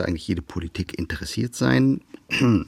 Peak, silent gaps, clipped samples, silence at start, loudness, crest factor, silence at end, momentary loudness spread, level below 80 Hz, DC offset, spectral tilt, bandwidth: -6 dBFS; none; under 0.1%; 0 s; -24 LUFS; 18 dB; 0 s; 11 LU; -46 dBFS; under 0.1%; -6 dB/octave; 14 kHz